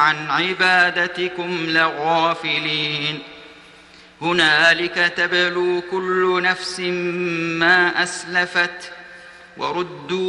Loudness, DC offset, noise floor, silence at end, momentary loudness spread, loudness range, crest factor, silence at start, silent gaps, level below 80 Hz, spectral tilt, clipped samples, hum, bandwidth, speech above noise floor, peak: -18 LUFS; under 0.1%; -46 dBFS; 0 s; 11 LU; 2 LU; 18 dB; 0 s; none; -60 dBFS; -3.5 dB/octave; under 0.1%; none; 11 kHz; 26 dB; -2 dBFS